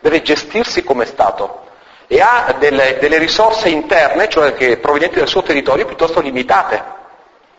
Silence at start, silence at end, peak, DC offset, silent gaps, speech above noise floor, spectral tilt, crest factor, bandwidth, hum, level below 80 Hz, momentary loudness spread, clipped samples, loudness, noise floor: 0 s; 0.55 s; 0 dBFS; under 0.1%; none; 32 dB; -3.5 dB/octave; 14 dB; 8 kHz; none; -44 dBFS; 5 LU; under 0.1%; -13 LUFS; -45 dBFS